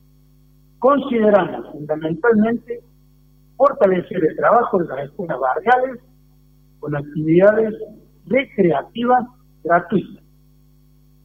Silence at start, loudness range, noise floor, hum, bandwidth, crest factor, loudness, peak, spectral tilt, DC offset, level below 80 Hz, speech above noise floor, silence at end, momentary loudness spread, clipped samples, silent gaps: 0.8 s; 2 LU; -52 dBFS; none; 15 kHz; 16 dB; -18 LUFS; -2 dBFS; -9 dB/octave; under 0.1%; -54 dBFS; 34 dB; 1.1 s; 16 LU; under 0.1%; none